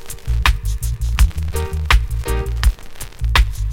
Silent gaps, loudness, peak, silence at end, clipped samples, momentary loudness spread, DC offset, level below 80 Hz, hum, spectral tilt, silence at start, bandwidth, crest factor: none; -19 LUFS; 0 dBFS; 0 s; under 0.1%; 7 LU; under 0.1%; -18 dBFS; none; -4 dB/octave; 0 s; 16.5 kHz; 18 dB